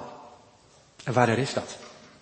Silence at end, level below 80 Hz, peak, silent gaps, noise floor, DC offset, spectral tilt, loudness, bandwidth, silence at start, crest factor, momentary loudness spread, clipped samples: 0.3 s; -66 dBFS; -6 dBFS; none; -57 dBFS; under 0.1%; -5.5 dB/octave; -26 LUFS; 8.8 kHz; 0 s; 24 dB; 23 LU; under 0.1%